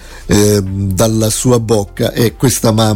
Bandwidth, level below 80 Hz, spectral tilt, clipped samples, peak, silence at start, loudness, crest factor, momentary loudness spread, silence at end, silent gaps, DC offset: 17 kHz; -32 dBFS; -5 dB/octave; under 0.1%; 0 dBFS; 0 s; -12 LUFS; 12 dB; 4 LU; 0 s; none; under 0.1%